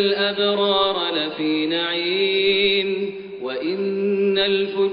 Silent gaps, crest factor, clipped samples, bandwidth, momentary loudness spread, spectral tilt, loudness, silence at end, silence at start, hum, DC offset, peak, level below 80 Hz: none; 14 dB; under 0.1%; 5.2 kHz; 8 LU; -1.5 dB/octave; -20 LUFS; 0 s; 0 s; none; under 0.1%; -6 dBFS; -60 dBFS